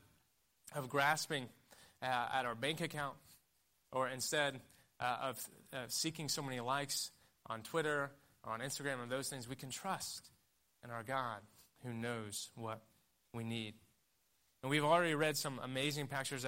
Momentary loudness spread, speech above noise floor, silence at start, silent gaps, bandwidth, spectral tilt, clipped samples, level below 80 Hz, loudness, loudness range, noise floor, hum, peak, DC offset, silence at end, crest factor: 14 LU; 38 dB; 0.65 s; none; 16 kHz; -3.5 dB/octave; under 0.1%; -78 dBFS; -40 LUFS; 6 LU; -78 dBFS; none; -20 dBFS; under 0.1%; 0 s; 22 dB